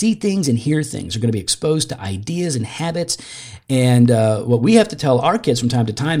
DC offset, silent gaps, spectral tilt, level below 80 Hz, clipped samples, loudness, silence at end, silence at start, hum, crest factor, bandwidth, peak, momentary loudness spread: under 0.1%; none; -5.5 dB/octave; -52 dBFS; under 0.1%; -18 LUFS; 0 s; 0 s; none; 16 dB; 15.5 kHz; 0 dBFS; 10 LU